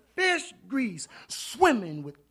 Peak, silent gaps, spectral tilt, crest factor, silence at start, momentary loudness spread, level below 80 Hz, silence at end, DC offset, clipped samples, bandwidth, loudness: -8 dBFS; none; -3.5 dB/octave; 22 dB; 0.15 s; 15 LU; -64 dBFS; 0.2 s; under 0.1%; under 0.1%; 14.5 kHz; -27 LUFS